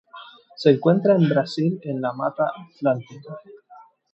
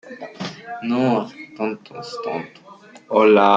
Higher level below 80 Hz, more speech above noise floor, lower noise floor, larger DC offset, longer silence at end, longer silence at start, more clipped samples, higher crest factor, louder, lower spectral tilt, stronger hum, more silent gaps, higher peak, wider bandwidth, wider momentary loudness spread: second, -76 dBFS vs -70 dBFS; about the same, 29 dB vs 27 dB; first, -50 dBFS vs -45 dBFS; neither; first, 0.55 s vs 0 s; about the same, 0.15 s vs 0.05 s; neither; about the same, 20 dB vs 18 dB; about the same, -21 LUFS vs -21 LUFS; first, -8 dB/octave vs -6.5 dB/octave; neither; neither; about the same, -2 dBFS vs -2 dBFS; about the same, 8.2 kHz vs 7.6 kHz; first, 22 LU vs 18 LU